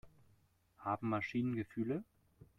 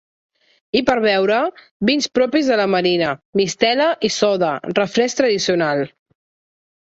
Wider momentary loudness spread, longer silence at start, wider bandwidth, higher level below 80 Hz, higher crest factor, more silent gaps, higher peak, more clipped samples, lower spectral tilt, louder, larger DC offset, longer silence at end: about the same, 5 LU vs 5 LU; second, 0.05 s vs 0.75 s; second, 7.2 kHz vs 8 kHz; second, -72 dBFS vs -58 dBFS; about the same, 18 dB vs 18 dB; second, none vs 1.71-1.80 s, 3.25-3.33 s; second, -24 dBFS vs -2 dBFS; neither; first, -8.5 dB/octave vs -4 dB/octave; second, -40 LUFS vs -18 LUFS; neither; second, 0.15 s vs 0.95 s